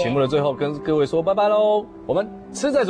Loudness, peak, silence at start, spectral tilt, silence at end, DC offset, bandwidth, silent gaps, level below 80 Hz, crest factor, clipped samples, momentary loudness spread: -21 LUFS; -8 dBFS; 0 s; -6 dB/octave; 0 s; under 0.1%; 10.5 kHz; none; -52 dBFS; 12 dB; under 0.1%; 7 LU